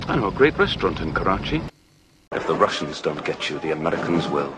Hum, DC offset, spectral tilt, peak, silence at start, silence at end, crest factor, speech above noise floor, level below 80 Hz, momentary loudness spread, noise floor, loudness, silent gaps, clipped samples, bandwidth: none; under 0.1%; -5.5 dB/octave; -2 dBFS; 0 s; 0 s; 20 dB; 34 dB; -42 dBFS; 9 LU; -56 dBFS; -22 LUFS; none; under 0.1%; 9.8 kHz